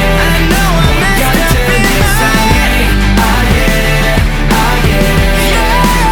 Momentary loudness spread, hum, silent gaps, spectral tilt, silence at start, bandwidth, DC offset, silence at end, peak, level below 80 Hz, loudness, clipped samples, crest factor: 1 LU; none; none; -4.5 dB/octave; 0 s; over 20 kHz; under 0.1%; 0 s; 0 dBFS; -12 dBFS; -10 LUFS; under 0.1%; 8 dB